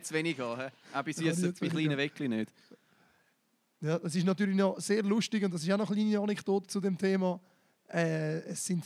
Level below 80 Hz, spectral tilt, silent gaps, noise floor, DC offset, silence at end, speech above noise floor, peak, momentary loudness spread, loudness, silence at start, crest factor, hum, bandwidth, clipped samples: -86 dBFS; -5.5 dB/octave; none; -75 dBFS; under 0.1%; 0 s; 43 dB; -16 dBFS; 8 LU; -32 LUFS; 0 s; 16 dB; none; 14 kHz; under 0.1%